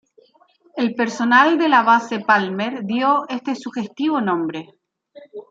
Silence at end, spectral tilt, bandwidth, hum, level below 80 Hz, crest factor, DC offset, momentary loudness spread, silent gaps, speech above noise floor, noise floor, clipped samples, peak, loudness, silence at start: 0.1 s; -5 dB/octave; 7.8 kHz; none; -72 dBFS; 18 dB; under 0.1%; 14 LU; none; 38 dB; -56 dBFS; under 0.1%; -2 dBFS; -18 LUFS; 0.75 s